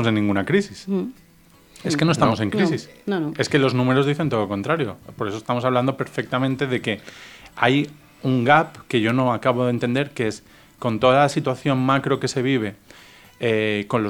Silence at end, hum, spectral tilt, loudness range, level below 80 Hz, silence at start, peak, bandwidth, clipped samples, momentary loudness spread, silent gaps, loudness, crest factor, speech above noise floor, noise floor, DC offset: 0 s; none; -6 dB/octave; 3 LU; -58 dBFS; 0 s; -2 dBFS; 19 kHz; under 0.1%; 11 LU; none; -21 LUFS; 20 dB; 31 dB; -52 dBFS; under 0.1%